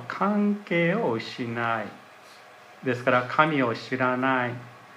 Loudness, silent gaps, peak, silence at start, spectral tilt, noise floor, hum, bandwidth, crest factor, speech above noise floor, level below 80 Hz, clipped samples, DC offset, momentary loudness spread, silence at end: -25 LUFS; none; -6 dBFS; 0 s; -7 dB/octave; -49 dBFS; none; 12.5 kHz; 22 dB; 24 dB; -74 dBFS; under 0.1%; under 0.1%; 9 LU; 0 s